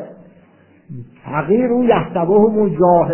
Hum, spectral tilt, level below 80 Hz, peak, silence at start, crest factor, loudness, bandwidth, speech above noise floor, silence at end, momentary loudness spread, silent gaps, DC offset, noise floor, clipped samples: none; -12 dB/octave; -48 dBFS; 0 dBFS; 0 s; 16 dB; -15 LUFS; 3.2 kHz; 36 dB; 0 s; 22 LU; none; under 0.1%; -49 dBFS; under 0.1%